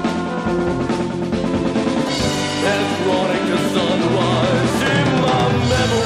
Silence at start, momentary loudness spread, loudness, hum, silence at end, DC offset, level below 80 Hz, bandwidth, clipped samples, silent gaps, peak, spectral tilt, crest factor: 0 s; 5 LU; -18 LUFS; none; 0 s; under 0.1%; -40 dBFS; 13.5 kHz; under 0.1%; none; -8 dBFS; -5.5 dB/octave; 10 dB